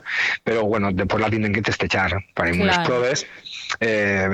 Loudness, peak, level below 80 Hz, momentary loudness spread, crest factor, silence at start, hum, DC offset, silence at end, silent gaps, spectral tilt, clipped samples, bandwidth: -21 LUFS; -4 dBFS; -46 dBFS; 5 LU; 18 dB; 0.05 s; none; under 0.1%; 0 s; none; -5 dB/octave; under 0.1%; 11 kHz